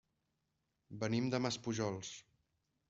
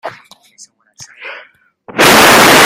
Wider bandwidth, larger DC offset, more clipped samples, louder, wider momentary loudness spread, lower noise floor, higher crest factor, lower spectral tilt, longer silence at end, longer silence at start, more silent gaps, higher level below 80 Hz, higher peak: second, 8 kHz vs over 20 kHz; neither; second, under 0.1% vs 0.6%; second, -39 LUFS vs -5 LUFS; second, 16 LU vs 25 LU; first, -85 dBFS vs -43 dBFS; first, 20 dB vs 10 dB; first, -5 dB/octave vs -2 dB/octave; first, 0.7 s vs 0 s; first, 0.9 s vs 0.05 s; neither; second, -74 dBFS vs -42 dBFS; second, -20 dBFS vs 0 dBFS